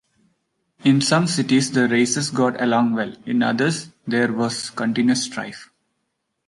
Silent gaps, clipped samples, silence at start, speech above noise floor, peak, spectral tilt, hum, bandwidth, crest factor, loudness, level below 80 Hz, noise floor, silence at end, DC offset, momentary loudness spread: none; under 0.1%; 0.85 s; 55 dB; -4 dBFS; -4.5 dB/octave; none; 11.5 kHz; 18 dB; -20 LUFS; -64 dBFS; -75 dBFS; 0.85 s; under 0.1%; 8 LU